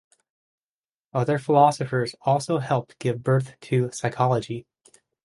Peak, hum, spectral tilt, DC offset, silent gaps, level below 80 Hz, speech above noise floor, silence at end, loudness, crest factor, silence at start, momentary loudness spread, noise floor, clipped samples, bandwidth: -4 dBFS; none; -6.5 dB/octave; under 0.1%; none; -62 dBFS; over 67 dB; 0.65 s; -24 LUFS; 20 dB; 1.15 s; 9 LU; under -90 dBFS; under 0.1%; 11.5 kHz